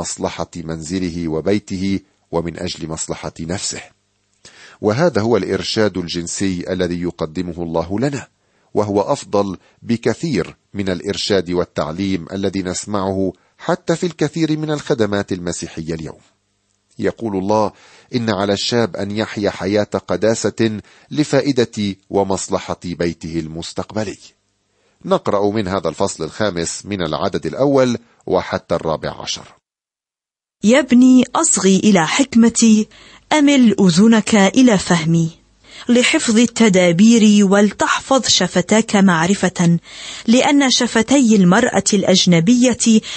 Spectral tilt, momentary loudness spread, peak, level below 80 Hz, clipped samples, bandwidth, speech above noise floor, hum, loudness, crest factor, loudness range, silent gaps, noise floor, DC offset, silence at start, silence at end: -4.5 dB/octave; 13 LU; -2 dBFS; -48 dBFS; under 0.1%; 8.8 kHz; 74 dB; none; -16 LUFS; 14 dB; 9 LU; none; -90 dBFS; under 0.1%; 0 s; 0 s